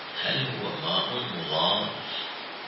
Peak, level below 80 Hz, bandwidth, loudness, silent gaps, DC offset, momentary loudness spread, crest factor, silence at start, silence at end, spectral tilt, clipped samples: -10 dBFS; -70 dBFS; 5.8 kHz; -27 LUFS; none; under 0.1%; 8 LU; 18 dB; 0 s; 0 s; -8 dB/octave; under 0.1%